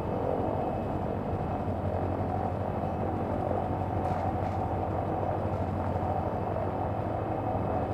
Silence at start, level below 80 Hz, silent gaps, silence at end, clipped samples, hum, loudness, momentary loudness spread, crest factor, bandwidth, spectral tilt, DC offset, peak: 0 s; -46 dBFS; none; 0 s; under 0.1%; none; -31 LUFS; 2 LU; 14 dB; 8.4 kHz; -9.5 dB/octave; under 0.1%; -16 dBFS